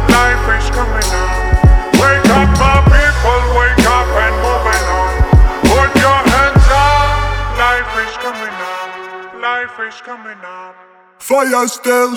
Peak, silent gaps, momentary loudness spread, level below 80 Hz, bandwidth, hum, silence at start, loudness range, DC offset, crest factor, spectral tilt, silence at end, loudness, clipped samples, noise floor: 0 dBFS; none; 15 LU; -16 dBFS; 17.5 kHz; none; 0 s; 9 LU; under 0.1%; 12 dB; -5 dB/octave; 0 s; -12 LUFS; under 0.1%; -43 dBFS